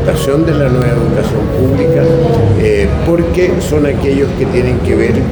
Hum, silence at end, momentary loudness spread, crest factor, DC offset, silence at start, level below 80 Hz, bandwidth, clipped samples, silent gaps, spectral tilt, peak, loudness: none; 0 s; 3 LU; 10 dB; under 0.1%; 0 s; -24 dBFS; over 20 kHz; under 0.1%; none; -7.5 dB/octave; 0 dBFS; -11 LUFS